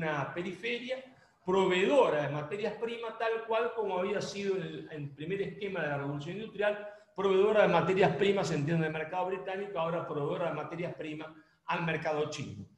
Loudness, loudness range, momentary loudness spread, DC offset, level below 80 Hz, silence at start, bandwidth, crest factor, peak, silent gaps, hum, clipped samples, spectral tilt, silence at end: -32 LUFS; 6 LU; 15 LU; under 0.1%; -70 dBFS; 0 s; 10.5 kHz; 20 dB; -12 dBFS; none; none; under 0.1%; -6 dB/octave; 0.1 s